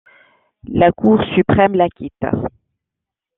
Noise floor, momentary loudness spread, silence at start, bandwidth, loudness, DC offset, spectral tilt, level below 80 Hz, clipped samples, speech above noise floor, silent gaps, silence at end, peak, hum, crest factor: -83 dBFS; 11 LU; 0.65 s; 4 kHz; -16 LUFS; under 0.1%; -10.5 dB/octave; -44 dBFS; under 0.1%; 68 dB; none; 0.9 s; 0 dBFS; none; 16 dB